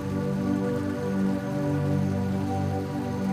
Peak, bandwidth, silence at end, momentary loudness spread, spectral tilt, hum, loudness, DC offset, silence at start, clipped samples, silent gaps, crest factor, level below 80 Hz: -16 dBFS; 15.5 kHz; 0 s; 3 LU; -8 dB/octave; none; -27 LUFS; under 0.1%; 0 s; under 0.1%; none; 12 dB; -52 dBFS